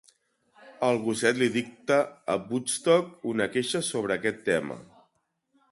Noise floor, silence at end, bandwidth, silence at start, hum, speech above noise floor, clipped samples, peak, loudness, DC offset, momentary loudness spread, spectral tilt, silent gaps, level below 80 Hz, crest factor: -74 dBFS; 0.9 s; 11.5 kHz; 0.65 s; none; 47 dB; under 0.1%; -8 dBFS; -27 LUFS; under 0.1%; 7 LU; -4 dB/octave; none; -68 dBFS; 20 dB